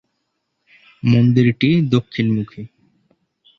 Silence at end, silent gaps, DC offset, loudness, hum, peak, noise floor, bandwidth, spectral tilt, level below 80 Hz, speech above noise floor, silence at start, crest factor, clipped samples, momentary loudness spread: 0.9 s; none; under 0.1%; -17 LUFS; none; -2 dBFS; -72 dBFS; 6.6 kHz; -8.5 dB/octave; -52 dBFS; 57 dB; 1.05 s; 18 dB; under 0.1%; 18 LU